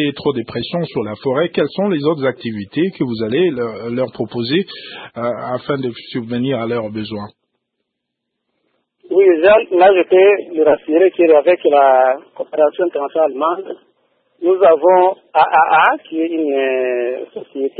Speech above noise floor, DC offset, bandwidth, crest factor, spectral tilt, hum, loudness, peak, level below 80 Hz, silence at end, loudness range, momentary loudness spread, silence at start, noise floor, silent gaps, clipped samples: 62 dB; under 0.1%; 4.8 kHz; 16 dB; -10 dB/octave; none; -15 LUFS; 0 dBFS; -58 dBFS; 0.1 s; 11 LU; 13 LU; 0 s; -76 dBFS; none; under 0.1%